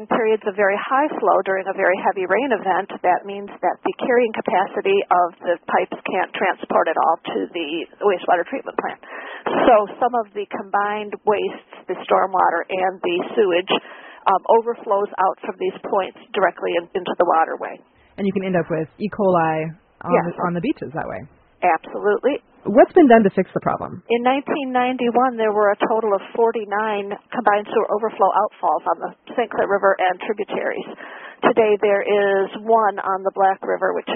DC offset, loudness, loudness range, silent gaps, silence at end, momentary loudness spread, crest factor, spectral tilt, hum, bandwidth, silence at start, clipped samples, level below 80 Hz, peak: under 0.1%; -20 LUFS; 4 LU; none; 0 s; 10 LU; 20 dB; -1 dB/octave; none; 3.9 kHz; 0 s; under 0.1%; -62 dBFS; 0 dBFS